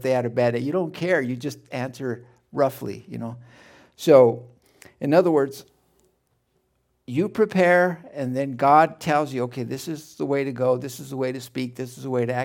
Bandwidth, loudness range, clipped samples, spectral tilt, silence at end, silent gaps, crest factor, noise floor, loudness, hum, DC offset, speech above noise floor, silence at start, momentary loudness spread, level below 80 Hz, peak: 17 kHz; 5 LU; under 0.1%; -6.5 dB/octave; 0 s; none; 22 dB; -70 dBFS; -22 LUFS; none; under 0.1%; 47 dB; 0 s; 17 LU; -68 dBFS; -2 dBFS